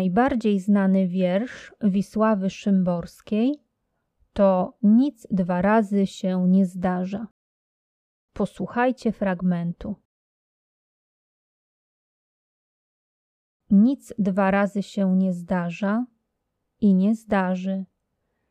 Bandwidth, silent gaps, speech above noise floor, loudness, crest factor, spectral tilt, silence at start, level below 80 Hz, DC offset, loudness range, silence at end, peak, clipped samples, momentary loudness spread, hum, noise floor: 9 kHz; 7.31-8.28 s, 10.05-13.60 s; 56 dB; -23 LUFS; 16 dB; -8 dB/octave; 0 s; -56 dBFS; under 0.1%; 6 LU; 0.65 s; -8 dBFS; under 0.1%; 11 LU; none; -78 dBFS